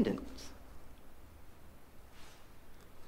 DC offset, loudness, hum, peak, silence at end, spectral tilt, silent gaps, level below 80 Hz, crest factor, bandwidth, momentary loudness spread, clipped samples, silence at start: under 0.1%; -45 LUFS; none; -20 dBFS; 0 s; -6 dB/octave; none; -56 dBFS; 22 dB; 16 kHz; 15 LU; under 0.1%; 0 s